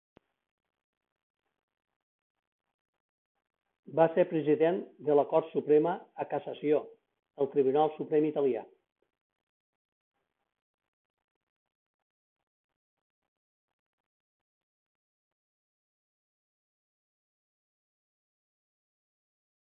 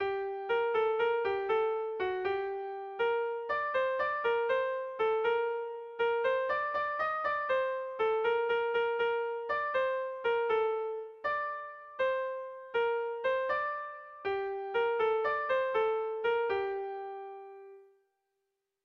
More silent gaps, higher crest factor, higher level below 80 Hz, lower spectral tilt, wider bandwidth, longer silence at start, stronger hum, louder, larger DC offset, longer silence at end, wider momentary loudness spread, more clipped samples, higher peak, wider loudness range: neither; first, 24 dB vs 12 dB; second, -86 dBFS vs -70 dBFS; first, -10 dB/octave vs -5 dB/octave; second, 3.8 kHz vs 5.6 kHz; first, 3.9 s vs 0 s; neither; first, -29 LUFS vs -32 LUFS; neither; first, 11.1 s vs 1 s; about the same, 10 LU vs 9 LU; neither; first, -10 dBFS vs -20 dBFS; first, 7 LU vs 3 LU